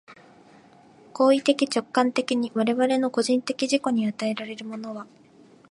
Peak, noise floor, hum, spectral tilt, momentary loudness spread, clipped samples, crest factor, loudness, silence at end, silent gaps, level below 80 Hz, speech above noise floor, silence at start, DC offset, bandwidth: -6 dBFS; -53 dBFS; none; -4 dB/octave; 14 LU; under 0.1%; 18 dB; -24 LUFS; 0.65 s; none; -78 dBFS; 29 dB; 0.1 s; under 0.1%; 11.5 kHz